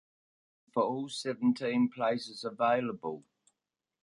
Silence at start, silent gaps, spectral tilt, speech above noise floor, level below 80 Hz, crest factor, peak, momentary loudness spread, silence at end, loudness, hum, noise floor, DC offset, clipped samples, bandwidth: 0.75 s; none; -5.5 dB/octave; 58 dB; -76 dBFS; 18 dB; -14 dBFS; 11 LU; 0.85 s; -32 LUFS; none; -89 dBFS; under 0.1%; under 0.1%; 11.5 kHz